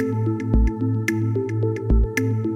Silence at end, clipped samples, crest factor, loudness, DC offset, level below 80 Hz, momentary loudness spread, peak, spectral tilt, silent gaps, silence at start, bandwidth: 0 s; under 0.1%; 14 dB; -22 LUFS; under 0.1%; -24 dBFS; 3 LU; -6 dBFS; -7.5 dB/octave; none; 0 s; 15 kHz